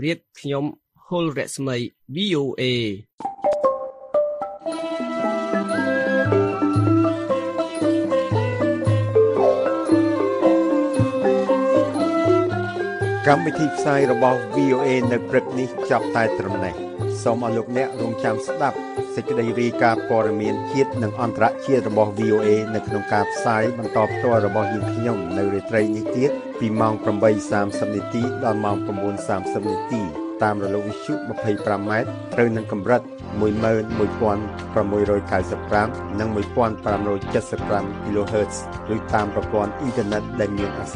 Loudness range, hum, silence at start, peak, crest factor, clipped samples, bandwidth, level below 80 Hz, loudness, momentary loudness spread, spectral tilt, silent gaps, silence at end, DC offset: 5 LU; none; 0 s; -2 dBFS; 20 dB; under 0.1%; 11.5 kHz; -48 dBFS; -22 LUFS; 8 LU; -6.5 dB/octave; 3.13-3.18 s; 0 s; under 0.1%